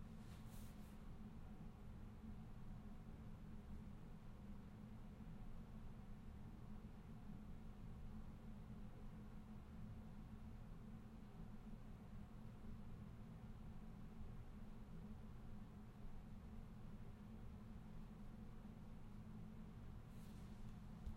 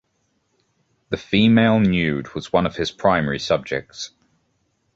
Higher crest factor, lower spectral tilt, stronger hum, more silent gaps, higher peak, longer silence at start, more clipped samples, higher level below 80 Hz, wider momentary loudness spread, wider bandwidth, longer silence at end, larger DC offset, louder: about the same, 16 dB vs 18 dB; first, -7.5 dB/octave vs -6 dB/octave; neither; neither; second, -38 dBFS vs -2 dBFS; second, 0 s vs 1.1 s; neither; second, -58 dBFS vs -46 dBFS; second, 2 LU vs 15 LU; first, 15.5 kHz vs 7.8 kHz; second, 0 s vs 0.9 s; neither; second, -59 LUFS vs -20 LUFS